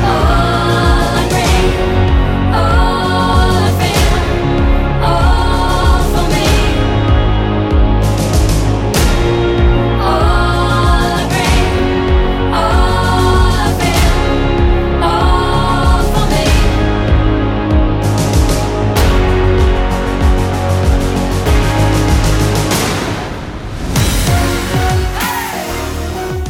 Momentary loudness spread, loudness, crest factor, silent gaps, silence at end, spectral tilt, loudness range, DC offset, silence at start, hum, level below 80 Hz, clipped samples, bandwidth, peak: 3 LU; -13 LUFS; 10 dB; none; 0 s; -5.5 dB/octave; 2 LU; under 0.1%; 0 s; none; -14 dBFS; under 0.1%; 17 kHz; 0 dBFS